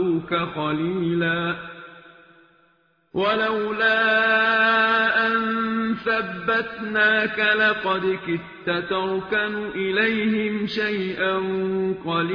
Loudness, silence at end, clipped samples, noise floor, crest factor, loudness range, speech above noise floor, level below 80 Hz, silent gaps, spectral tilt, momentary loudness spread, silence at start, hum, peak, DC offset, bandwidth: -21 LUFS; 0 s; under 0.1%; -63 dBFS; 16 dB; 5 LU; 40 dB; -58 dBFS; none; -7 dB/octave; 9 LU; 0 s; none; -6 dBFS; under 0.1%; 5.4 kHz